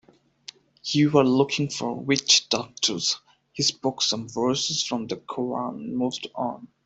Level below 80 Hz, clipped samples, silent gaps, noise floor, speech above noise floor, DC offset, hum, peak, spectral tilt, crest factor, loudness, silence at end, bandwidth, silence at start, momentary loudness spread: -66 dBFS; under 0.1%; none; -48 dBFS; 23 dB; under 0.1%; none; -4 dBFS; -3.5 dB/octave; 22 dB; -24 LUFS; 0.2 s; 8.4 kHz; 0.85 s; 13 LU